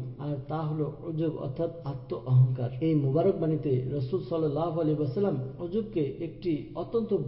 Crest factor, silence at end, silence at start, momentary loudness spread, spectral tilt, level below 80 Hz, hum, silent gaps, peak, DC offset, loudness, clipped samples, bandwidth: 16 dB; 0 s; 0 s; 8 LU; -13 dB/octave; -56 dBFS; none; none; -14 dBFS; under 0.1%; -29 LUFS; under 0.1%; 5.6 kHz